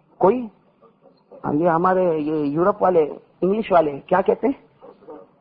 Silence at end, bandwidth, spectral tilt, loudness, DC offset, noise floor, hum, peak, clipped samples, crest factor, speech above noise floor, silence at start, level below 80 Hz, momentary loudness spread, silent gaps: 0.2 s; 5.4 kHz; -11.5 dB/octave; -20 LUFS; under 0.1%; -54 dBFS; none; -4 dBFS; under 0.1%; 16 dB; 35 dB; 0.2 s; -56 dBFS; 9 LU; none